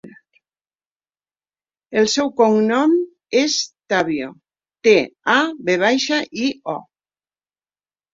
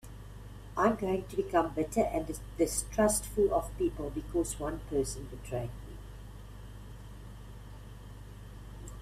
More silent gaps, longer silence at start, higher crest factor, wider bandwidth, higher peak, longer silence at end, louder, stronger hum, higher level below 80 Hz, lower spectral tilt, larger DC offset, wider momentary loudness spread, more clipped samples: neither; about the same, 0.05 s vs 0.05 s; about the same, 18 dB vs 20 dB; second, 7.8 kHz vs 16 kHz; first, -2 dBFS vs -14 dBFS; first, 1.3 s vs 0 s; first, -18 LUFS vs -32 LUFS; second, none vs 50 Hz at -45 dBFS; second, -64 dBFS vs -46 dBFS; second, -3.5 dB/octave vs -5 dB/octave; neither; second, 9 LU vs 20 LU; neither